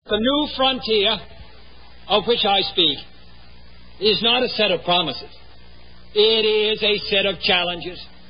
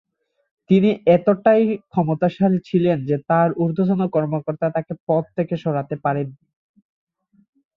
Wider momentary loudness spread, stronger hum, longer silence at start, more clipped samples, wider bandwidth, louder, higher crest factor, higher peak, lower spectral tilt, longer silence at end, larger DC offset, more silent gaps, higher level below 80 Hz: about the same, 9 LU vs 8 LU; first, 60 Hz at -50 dBFS vs none; second, 0 s vs 0.7 s; neither; about the same, 5.4 kHz vs 5.2 kHz; about the same, -18 LUFS vs -20 LUFS; about the same, 18 dB vs 16 dB; about the same, -4 dBFS vs -4 dBFS; second, -8.5 dB/octave vs -10 dB/octave; second, 0.25 s vs 1.45 s; first, 0.9% vs under 0.1%; second, none vs 5.00-5.07 s; first, -48 dBFS vs -60 dBFS